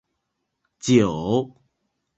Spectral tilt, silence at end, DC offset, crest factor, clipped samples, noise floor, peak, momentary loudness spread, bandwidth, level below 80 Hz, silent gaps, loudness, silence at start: -6 dB/octave; 0.7 s; under 0.1%; 20 dB; under 0.1%; -78 dBFS; -4 dBFS; 13 LU; 8.2 kHz; -54 dBFS; none; -21 LUFS; 0.85 s